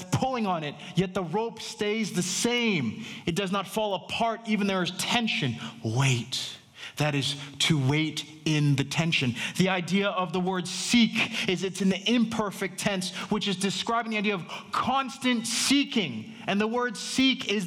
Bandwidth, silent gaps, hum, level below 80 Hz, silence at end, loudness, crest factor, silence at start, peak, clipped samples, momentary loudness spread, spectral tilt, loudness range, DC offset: 17 kHz; none; none; -62 dBFS; 0 s; -27 LUFS; 20 dB; 0 s; -8 dBFS; under 0.1%; 7 LU; -4 dB/octave; 2 LU; under 0.1%